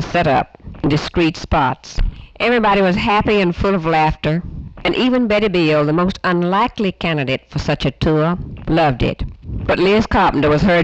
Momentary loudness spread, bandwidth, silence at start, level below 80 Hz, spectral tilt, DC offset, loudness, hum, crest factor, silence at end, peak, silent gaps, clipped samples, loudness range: 9 LU; 8.2 kHz; 0 s; -30 dBFS; -7 dB/octave; under 0.1%; -16 LUFS; none; 10 dB; 0 s; -6 dBFS; none; under 0.1%; 2 LU